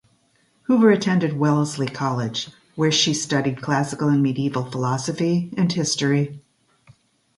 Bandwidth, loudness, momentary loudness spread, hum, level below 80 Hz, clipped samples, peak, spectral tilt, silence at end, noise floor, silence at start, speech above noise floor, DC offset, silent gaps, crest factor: 11.5 kHz; -21 LUFS; 8 LU; none; -62 dBFS; under 0.1%; -4 dBFS; -5 dB/octave; 1 s; -63 dBFS; 0.7 s; 42 dB; under 0.1%; none; 18 dB